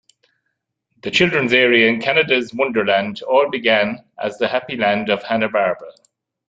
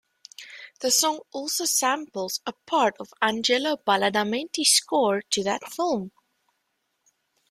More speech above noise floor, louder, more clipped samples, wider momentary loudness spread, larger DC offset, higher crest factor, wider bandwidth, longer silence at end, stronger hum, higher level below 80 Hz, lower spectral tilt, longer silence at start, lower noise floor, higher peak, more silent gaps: first, 57 dB vs 51 dB; first, -17 LUFS vs -24 LUFS; neither; second, 9 LU vs 12 LU; neither; about the same, 16 dB vs 20 dB; second, 9 kHz vs 16 kHz; second, 0.55 s vs 1.4 s; neither; first, -60 dBFS vs -72 dBFS; first, -5 dB/octave vs -1.5 dB/octave; first, 1.05 s vs 0.4 s; about the same, -75 dBFS vs -76 dBFS; first, -2 dBFS vs -6 dBFS; neither